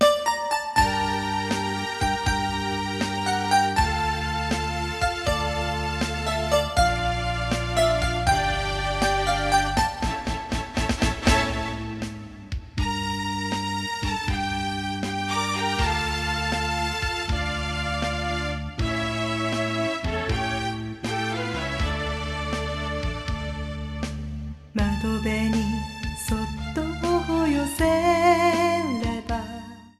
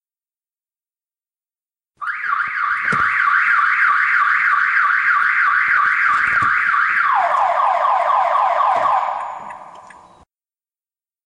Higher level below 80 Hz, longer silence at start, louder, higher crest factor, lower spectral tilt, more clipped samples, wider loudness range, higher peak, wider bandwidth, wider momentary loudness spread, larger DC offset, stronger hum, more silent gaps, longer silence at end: first, -34 dBFS vs -60 dBFS; second, 0 s vs 2 s; second, -25 LUFS vs -15 LUFS; about the same, 18 dB vs 14 dB; first, -4.5 dB/octave vs -3 dB/octave; neither; about the same, 5 LU vs 6 LU; second, -8 dBFS vs -4 dBFS; first, 14.5 kHz vs 11 kHz; about the same, 9 LU vs 8 LU; neither; neither; neither; second, 0.1 s vs 1.4 s